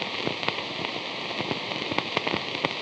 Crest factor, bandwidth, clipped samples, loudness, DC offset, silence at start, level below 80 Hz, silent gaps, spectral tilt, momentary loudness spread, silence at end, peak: 26 dB; 10 kHz; under 0.1%; -28 LUFS; under 0.1%; 0 s; -66 dBFS; none; -4 dB/octave; 3 LU; 0 s; -4 dBFS